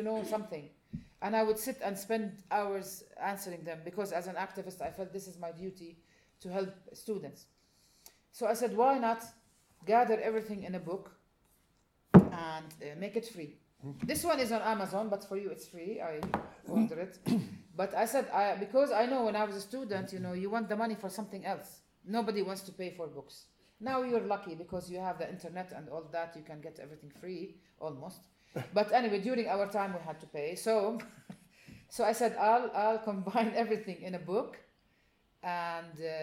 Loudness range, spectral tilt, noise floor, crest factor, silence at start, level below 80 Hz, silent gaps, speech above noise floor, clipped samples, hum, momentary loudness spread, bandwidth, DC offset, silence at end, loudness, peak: 10 LU; -6 dB/octave; -72 dBFS; 28 dB; 0 s; -64 dBFS; none; 37 dB; under 0.1%; none; 17 LU; 17 kHz; under 0.1%; 0 s; -34 LUFS; -6 dBFS